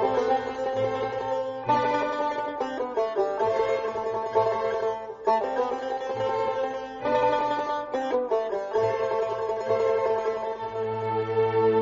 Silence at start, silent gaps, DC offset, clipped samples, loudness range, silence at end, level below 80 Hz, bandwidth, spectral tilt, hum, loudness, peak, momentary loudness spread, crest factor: 0 s; none; under 0.1%; under 0.1%; 1 LU; 0 s; -60 dBFS; 7.6 kHz; -4 dB/octave; none; -27 LUFS; -10 dBFS; 6 LU; 16 dB